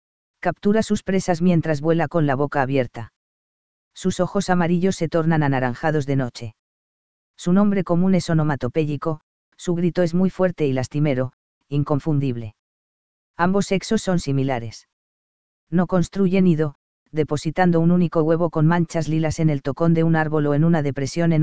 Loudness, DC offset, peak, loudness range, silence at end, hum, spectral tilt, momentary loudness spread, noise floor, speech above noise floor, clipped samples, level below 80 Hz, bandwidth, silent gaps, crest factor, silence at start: -21 LUFS; 2%; -2 dBFS; 4 LU; 0 s; none; -7 dB/octave; 9 LU; under -90 dBFS; over 70 dB; under 0.1%; -48 dBFS; 8 kHz; 3.16-3.91 s, 6.59-7.34 s, 9.23-9.52 s, 11.33-11.61 s, 12.59-13.34 s, 14.93-15.67 s, 16.75-17.06 s; 18 dB; 0.35 s